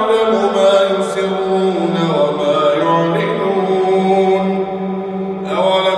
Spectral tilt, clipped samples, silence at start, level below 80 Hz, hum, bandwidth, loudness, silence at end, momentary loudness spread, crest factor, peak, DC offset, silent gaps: -6 dB/octave; under 0.1%; 0 s; -56 dBFS; none; 11 kHz; -15 LUFS; 0 s; 8 LU; 12 dB; -2 dBFS; under 0.1%; none